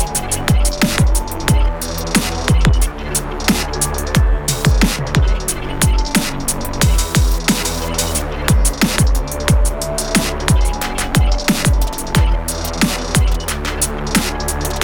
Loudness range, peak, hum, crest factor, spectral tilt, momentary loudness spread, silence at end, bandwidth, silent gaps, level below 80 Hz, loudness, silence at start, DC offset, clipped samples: 1 LU; -2 dBFS; none; 14 dB; -4 dB/octave; 6 LU; 0 s; over 20 kHz; none; -18 dBFS; -17 LUFS; 0 s; under 0.1%; under 0.1%